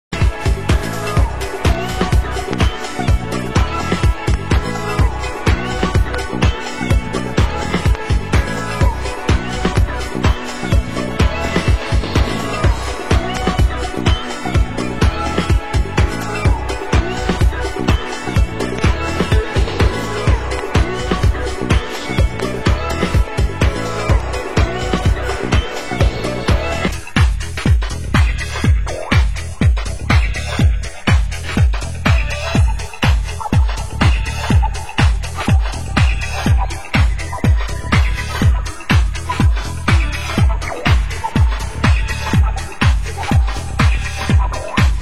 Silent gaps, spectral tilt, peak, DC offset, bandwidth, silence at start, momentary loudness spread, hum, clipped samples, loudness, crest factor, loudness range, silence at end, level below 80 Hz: none; -5.5 dB/octave; 0 dBFS; 3%; 13 kHz; 0.1 s; 4 LU; none; under 0.1%; -17 LUFS; 14 dB; 1 LU; 0 s; -18 dBFS